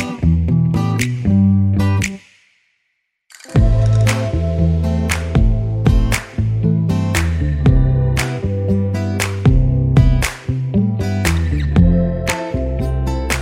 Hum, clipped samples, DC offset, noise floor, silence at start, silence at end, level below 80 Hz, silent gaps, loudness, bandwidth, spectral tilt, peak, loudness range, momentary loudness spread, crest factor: none; under 0.1%; under 0.1%; -70 dBFS; 0 s; 0 s; -22 dBFS; none; -16 LUFS; 16 kHz; -6.5 dB/octave; 0 dBFS; 2 LU; 7 LU; 14 dB